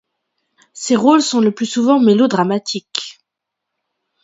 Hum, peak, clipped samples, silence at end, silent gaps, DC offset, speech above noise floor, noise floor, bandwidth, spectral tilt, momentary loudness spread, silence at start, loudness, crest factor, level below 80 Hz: none; 0 dBFS; under 0.1%; 1.15 s; none; under 0.1%; 66 dB; -80 dBFS; 8 kHz; -4.5 dB/octave; 13 LU; 0.75 s; -15 LUFS; 16 dB; -64 dBFS